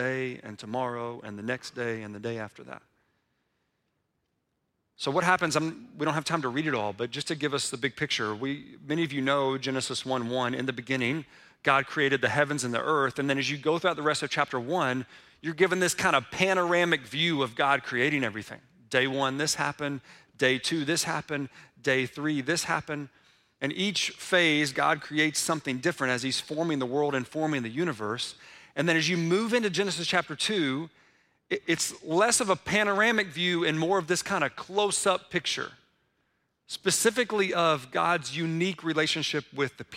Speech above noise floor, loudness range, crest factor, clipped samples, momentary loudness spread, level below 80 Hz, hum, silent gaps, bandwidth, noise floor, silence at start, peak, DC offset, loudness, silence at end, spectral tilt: 50 dB; 4 LU; 22 dB; under 0.1%; 11 LU; -68 dBFS; none; none; 16 kHz; -78 dBFS; 0 s; -8 dBFS; under 0.1%; -27 LUFS; 0 s; -3.5 dB/octave